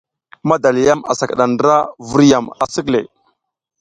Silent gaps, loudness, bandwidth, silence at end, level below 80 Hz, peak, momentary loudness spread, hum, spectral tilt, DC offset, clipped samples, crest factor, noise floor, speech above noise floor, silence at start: none; -15 LUFS; 9.4 kHz; 0.75 s; -50 dBFS; 0 dBFS; 8 LU; none; -5.5 dB/octave; under 0.1%; under 0.1%; 16 dB; -63 dBFS; 49 dB; 0.45 s